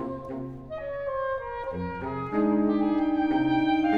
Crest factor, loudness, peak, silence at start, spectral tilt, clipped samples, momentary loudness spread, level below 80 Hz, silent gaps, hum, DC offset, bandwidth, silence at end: 14 dB; -28 LUFS; -12 dBFS; 0 s; -8.5 dB/octave; under 0.1%; 12 LU; -52 dBFS; none; none; under 0.1%; 5 kHz; 0 s